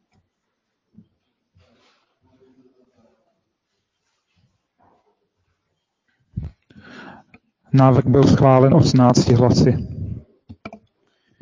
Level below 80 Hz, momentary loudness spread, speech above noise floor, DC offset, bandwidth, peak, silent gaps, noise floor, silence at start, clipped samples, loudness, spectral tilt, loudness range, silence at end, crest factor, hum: -42 dBFS; 25 LU; 63 dB; under 0.1%; 7.6 kHz; 0 dBFS; none; -76 dBFS; 6.35 s; under 0.1%; -15 LUFS; -7.5 dB/octave; 7 LU; 0.65 s; 20 dB; none